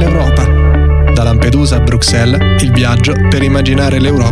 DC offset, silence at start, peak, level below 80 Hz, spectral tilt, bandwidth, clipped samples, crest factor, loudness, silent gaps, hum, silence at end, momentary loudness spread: under 0.1%; 0 s; 0 dBFS; -14 dBFS; -6 dB/octave; 12 kHz; under 0.1%; 8 dB; -10 LUFS; none; none; 0 s; 1 LU